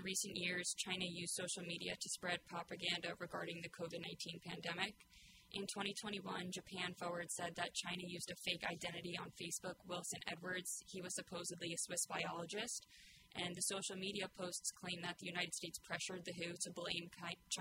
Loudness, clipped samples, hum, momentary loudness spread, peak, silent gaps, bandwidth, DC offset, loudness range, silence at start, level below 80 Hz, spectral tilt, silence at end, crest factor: -44 LUFS; under 0.1%; none; 7 LU; -24 dBFS; none; 16 kHz; under 0.1%; 2 LU; 0 s; -78 dBFS; -2 dB/octave; 0 s; 22 dB